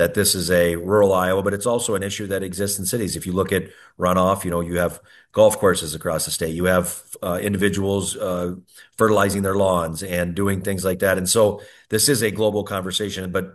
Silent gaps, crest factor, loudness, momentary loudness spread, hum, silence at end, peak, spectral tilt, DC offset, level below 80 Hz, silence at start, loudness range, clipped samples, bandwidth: none; 18 dB; -21 LUFS; 9 LU; none; 0.05 s; -2 dBFS; -4 dB/octave; under 0.1%; -52 dBFS; 0 s; 2 LU; under 0.1%; 13 kHz